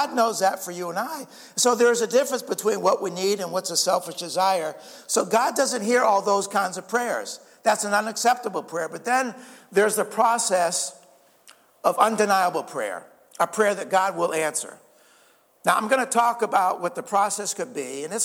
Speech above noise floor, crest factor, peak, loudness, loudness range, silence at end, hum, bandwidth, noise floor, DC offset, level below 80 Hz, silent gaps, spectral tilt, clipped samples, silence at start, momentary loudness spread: 35 dB; 20 dB; -4 dBFS; -23 LUFS; 2 LU; 0 s; none; 18 kHz; -59 dBFS; under 0.1%; -80 dBFS; none; -2.5 dB/octave; under 0.1%; 0 s; 10 LU